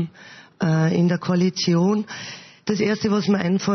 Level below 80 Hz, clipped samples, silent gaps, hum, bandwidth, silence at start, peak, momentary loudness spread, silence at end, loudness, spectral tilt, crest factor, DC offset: -62 dBFS; under 0.1%; none; none; 6.4 kHz; 0 s; -8 dBFS; 12 LU; 0 s; -21 LUFS; -6 dB/octave; 14 dB; under 0.1%